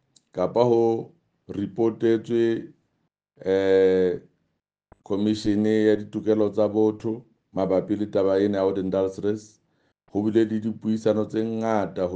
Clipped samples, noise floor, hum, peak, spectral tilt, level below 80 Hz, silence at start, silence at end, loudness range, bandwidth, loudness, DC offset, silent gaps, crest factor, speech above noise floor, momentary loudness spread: under 0.1%; -76 dBFS; none; -4 dBFS; -7.5 dB/octave; -64 dBFS; 0.35 s; 0 s; 2 LU; 8.6 kHz; -24 LUFS; under 0.1%; none; 18 dB; 54 dB; 11 LU